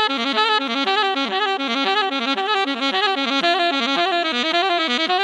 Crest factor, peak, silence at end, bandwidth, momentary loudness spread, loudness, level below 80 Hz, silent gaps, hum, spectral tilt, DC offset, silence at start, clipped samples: 16 dB; -4 dBFS; 0 s; 11 kHz; 3 LU; -19 LUFS; -76 dBFS; none; none; -2 dB/octave; under 0.1%; 0 s; under 0.1%